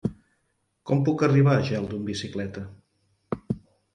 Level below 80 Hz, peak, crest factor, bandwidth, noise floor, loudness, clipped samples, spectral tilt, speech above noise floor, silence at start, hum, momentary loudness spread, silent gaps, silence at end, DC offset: -54 dBFS; -8 dBFS; 18 dB; 9.2 kHz; -73 dBFS; -26 LUFS; under 0.1%; -7.5 dB/octave; 50 dB; 0.05 s; none; 17 LU; none; 0.35 s; under 0.1%